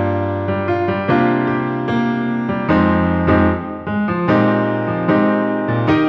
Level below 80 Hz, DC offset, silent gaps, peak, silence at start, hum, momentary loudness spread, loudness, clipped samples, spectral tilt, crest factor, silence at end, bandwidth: -40 dBFS; under 0.1%; none; -2 dBFS; 0 s; none; 5 LU; -17 LUFS; under 0.1%; -9.5 dB/octave; 14 dB; 0 s; 6.2 kHz